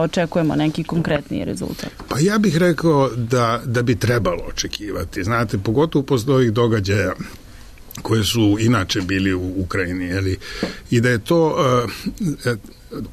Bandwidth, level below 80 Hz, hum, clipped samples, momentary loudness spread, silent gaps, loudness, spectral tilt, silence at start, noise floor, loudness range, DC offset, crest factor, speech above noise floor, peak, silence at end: 13.5 kHz; -40 dBFS; none; under 0.1%; 10 LU; none; -19 LUFS; -6 dB/octave; 0 s; -39 dBFS; 1 LU; under 0.1%; 12 dB; 20 dB; -6 dBFS; 0 s